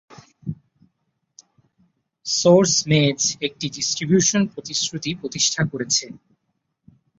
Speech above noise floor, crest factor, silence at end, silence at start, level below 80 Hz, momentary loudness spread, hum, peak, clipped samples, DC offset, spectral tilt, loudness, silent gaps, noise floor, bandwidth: 54 dB; 20 dB; 1.05 s; 0.1 s; -60 dBFS; 19 LU; none; -2 dBFS; under 0.1%; under 0.1%; -3.5 dB/octave; -19 LUFS; none; -74 dBFS; 8 kHz